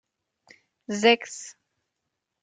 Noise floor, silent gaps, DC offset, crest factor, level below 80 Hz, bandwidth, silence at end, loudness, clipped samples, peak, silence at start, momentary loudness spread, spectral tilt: -82 dBFS; none; under 0.1%; 24 dB; -80 dBFS; 9.4 kHz; 0.9 s; -22 LUFS; under 0.1%; -4 dBFS; 0.9 s; 23 LU; -3 dB/octave